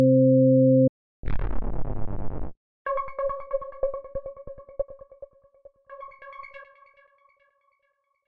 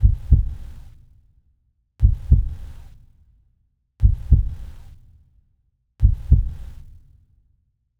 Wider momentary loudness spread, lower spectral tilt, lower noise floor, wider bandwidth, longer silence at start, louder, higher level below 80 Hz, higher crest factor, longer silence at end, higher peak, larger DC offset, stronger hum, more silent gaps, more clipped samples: first, 26 LU vs 22 LU; first, -13.5 dB/octave vs -10.5 dB/octave; first, -73 dBFS vs -66 dBFS; first, 3.5 kHz vs 1.7 kHz; about the same, 0 s vs 0 s; second, -25 LUFS vs -21 LUFS; second, -38 dBFS vs -22 dBFS; second, 14 dB vs 20 dB; second, 0 s vs 1.25 s; second, -10 dBFS vs -2 dBFS; neither; neither; first, 0.89-1.23 s, 2.57-2.85 s vs none; neither